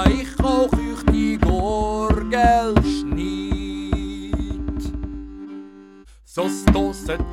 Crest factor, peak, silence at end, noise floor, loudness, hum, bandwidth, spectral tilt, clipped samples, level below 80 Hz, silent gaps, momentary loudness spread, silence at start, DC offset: 18 dB; -4 dBFS; 0 s; -46 dBFS; -21 LUFS; none; 14.5 kHz; -6.5 dB/octave; under 0.1%; -26 dBFS; none; 14 LU; 0 s; under 0.1%